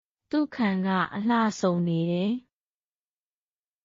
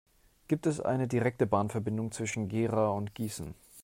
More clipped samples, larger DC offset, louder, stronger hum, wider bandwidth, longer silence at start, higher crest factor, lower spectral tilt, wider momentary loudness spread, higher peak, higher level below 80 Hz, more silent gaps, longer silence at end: neither; neither; first, -26 LUFS vs -32 LUFS; neither; second, 7.4 kHz vs 16 kHz; second, 0.3 s vs 0.5 s; second, 14 dB vs 20 dB; about the same, -6 dB/octave vs -6.5 dB/octave; second, 5 LU vs 8 LU; about the same, -12 dBFS vs -12 dBFS; second, -68 dBFS vs -62 dBFS; neither; first, 1.45 s vs 0 s